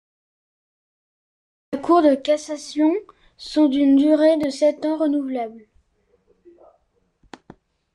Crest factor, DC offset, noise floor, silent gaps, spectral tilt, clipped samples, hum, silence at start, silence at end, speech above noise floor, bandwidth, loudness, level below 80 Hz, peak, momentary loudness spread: 16 dB; under 0.1%; -65 dBFS; none; -4.5 dB/octave; under 0.1%; none; 1.7 s; 2.35 s; 47 dB; 11 kHz; -19 LUFS; -62 dBFS; -6 dBFS; 13 LU